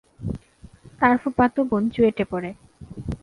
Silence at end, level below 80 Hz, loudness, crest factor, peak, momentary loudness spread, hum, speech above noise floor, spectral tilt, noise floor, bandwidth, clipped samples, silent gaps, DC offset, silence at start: 0.05 s; -44 dBFS; -22 LUFS; 20 dB; -4 dBFS; 16 LU; none; 28 dB; -8 dB/octave; -48 dBFS; 11 kHz; under 0.1%; none; under 0.1%; 0.2 s